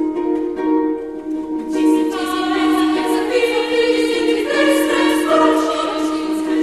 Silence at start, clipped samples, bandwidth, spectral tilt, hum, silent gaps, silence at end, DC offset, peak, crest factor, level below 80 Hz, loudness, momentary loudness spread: 0 s; under 0.1%; 13 kHz; -3 dB/octave; none; none; 0 s; 0.2%; -2 dBFS; 14 dB; -50 dBFS; -17 LUFS; 7 LU